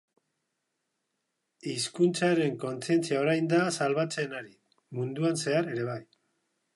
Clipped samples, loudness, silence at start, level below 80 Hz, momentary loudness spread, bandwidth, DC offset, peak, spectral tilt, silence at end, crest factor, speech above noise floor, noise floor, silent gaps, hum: under 0.1%; -29 LUFS; 1.65 s; -78 dBFS; 11 LU; 11.5 kHz; under 0.1%; -14 dBFS; -5 dB/octave; 0.7 s; 18 dB; 53 dB; -81 dBFS; none; none